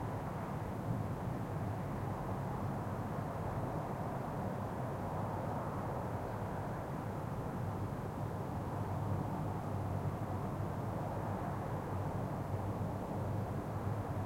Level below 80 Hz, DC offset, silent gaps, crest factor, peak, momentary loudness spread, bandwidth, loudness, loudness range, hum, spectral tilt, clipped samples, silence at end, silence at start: -54 dBFS; under 0.1%; none; 14 dB; -26 dBFS; 2 LU; 16.5 kHz; -40 LUFS; 1 LU; none; -8 dB/octave; under 0.1%; 0 s; 0 s